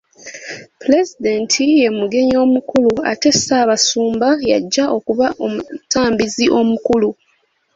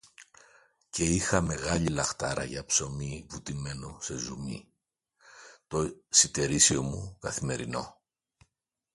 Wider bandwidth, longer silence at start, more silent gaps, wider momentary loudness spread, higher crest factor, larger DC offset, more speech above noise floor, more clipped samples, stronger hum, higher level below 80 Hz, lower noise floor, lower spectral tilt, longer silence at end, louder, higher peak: second, 8 kHz vs 11.5 kHz; about the same, 0.25 s vs 0.2 s; neither; second, 9 LU vs 16 LU; second, 14 dB vs 26 dB; neither; second, 46 dB vs 52 dB; neither; neither; about the same, -50 dBFS vs -50 dBFS; second, -61 dBFS vs -82 dBFS; about the same, -3 dB/octave vs -3 dB/octave; second, 0.65 s vs 1 s; first, -15 LUFS vs -28 LUFS; first, -2 dBFS vs -6 dBFS